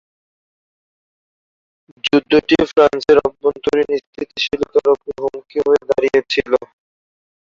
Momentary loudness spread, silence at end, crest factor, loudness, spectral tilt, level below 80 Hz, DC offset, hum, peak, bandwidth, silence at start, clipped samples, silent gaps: 9 LU; 0.9 s; 16 dB; -16 LUFS; -5 dB/octave; -50 dBFS; under 0.1%; none; -2 dBFS; 7.4 kHz; 2.05 s; under 0.1%; 4.07-4.13 s